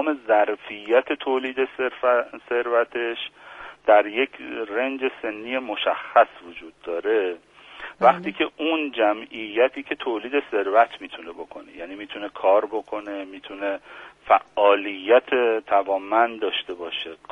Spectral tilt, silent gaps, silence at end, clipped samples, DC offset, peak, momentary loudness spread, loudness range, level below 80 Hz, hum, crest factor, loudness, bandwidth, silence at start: -5.5 dB/octave; none; 0.15 s; under 0.1%; under 0.1%; -2 dBFS; 18 LU; 4 LU; -66 dBFS; none; 20 dB; -23 LUFS; 6.4 kHz; 0 s